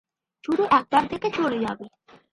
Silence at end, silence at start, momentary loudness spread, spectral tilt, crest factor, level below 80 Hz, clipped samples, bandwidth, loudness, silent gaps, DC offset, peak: 0.45 s; 0.5 s; 14 LU; -5.5 dB/octave; 18 dB; -60 dBFS; under 0.1%; 11.5 kHz; -23 LUFS; none; under 0.1%; -6 dBFS